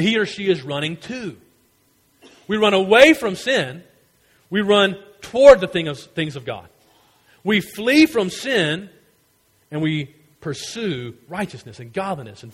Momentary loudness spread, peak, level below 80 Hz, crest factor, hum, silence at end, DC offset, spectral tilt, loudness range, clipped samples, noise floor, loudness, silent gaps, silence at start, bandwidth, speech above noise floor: 20 LU; 0 dBFS; -52 dBFS; 20 dB; none; 0.05 s; under 0.1%; -5 dB/octave; 10 LU; under 0.1%; -61 dBFS; -18 LUFS; none; 0 s; 16 kHz; 42 dB